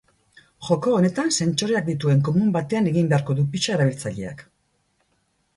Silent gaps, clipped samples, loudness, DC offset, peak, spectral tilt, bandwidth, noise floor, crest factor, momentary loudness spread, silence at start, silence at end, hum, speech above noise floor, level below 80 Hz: none; under 0.1%; -21 LUFS; under 0.1%; -6 dBFS; -5.5 dB/octave; 11.5 kHz; -68 dBFS; 16 dB; 11 LU; 0.6 s; 1.15 s; none; 47 dB; -58 dBFS